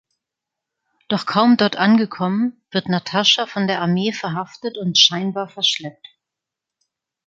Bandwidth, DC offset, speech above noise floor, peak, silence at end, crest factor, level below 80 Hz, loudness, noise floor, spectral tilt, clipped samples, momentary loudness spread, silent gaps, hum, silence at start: 7.8 kHz; under 0.1%; 66 dB; 0 dBFS; 1.35 s; 20 dB; -66 dBFS; -18 LUFS; -85 dBFS; -4 dB/octave; under 0.1%; 12 LU; none; none; 1.1 s